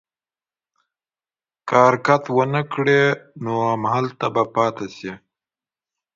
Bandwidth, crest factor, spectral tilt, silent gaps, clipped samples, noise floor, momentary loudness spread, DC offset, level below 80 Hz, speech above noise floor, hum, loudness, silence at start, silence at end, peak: 7.6 kHz; 22 dB; -6.5 dB/octave; none; under 0.1%; under -90 dBFS; 16 LU; under 0.1%; -64 dBFS; over 71 dB; none; -19 LUFS; 1.65 s; 1 s; 0 dBFS